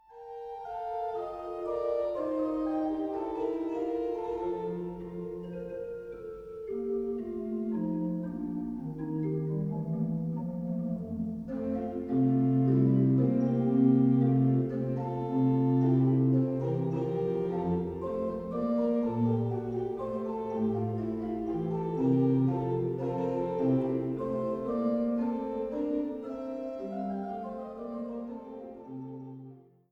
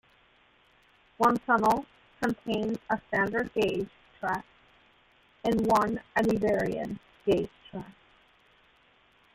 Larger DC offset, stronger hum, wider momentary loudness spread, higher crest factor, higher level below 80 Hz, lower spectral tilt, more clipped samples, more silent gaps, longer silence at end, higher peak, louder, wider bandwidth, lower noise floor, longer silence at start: neither; neither; about the same, 14 LU vs 14 LU; about the same, 18 dB vs 22 dB; about the same, -58 dBFS vs -58 dBFS; first, -11 dB/octave vs -6 dB/octave; neither; neither; second, 0.3 s vs 1.45 s; second, -14 dBFS vs -8 dBFS; about the same, -31 LUFS vs -29 LUFS; second, 5 kHz vs 16 kHz; second, -51 dBFS vs -63 dBFS; second, 0.1 s vs 1.2 s